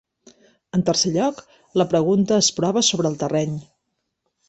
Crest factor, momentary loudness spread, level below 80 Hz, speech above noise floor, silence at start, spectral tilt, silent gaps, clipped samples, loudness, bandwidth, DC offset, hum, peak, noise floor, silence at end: 18 dB; 8 LU; -58 dBFS; 56 dB; 0.75 s; -4.5 dB/octave; none; under 0.1%; -20 LUFS; 8.4 kHz; under 0.1%; none; -4 dBFS; -76 dBFS; 0.85 s